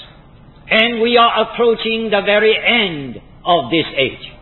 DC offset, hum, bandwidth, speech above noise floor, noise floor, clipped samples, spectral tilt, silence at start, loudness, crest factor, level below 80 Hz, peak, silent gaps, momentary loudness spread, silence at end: under 0.1%; none; 4.3 kHz; 27 dB; -42 dBFS; under 0.1%; -7.5 dB/octave; 0 s; -14 LUFS; 16 dB; -48 dBFS; 0 dBFS; none; 8 LU; 0.1 s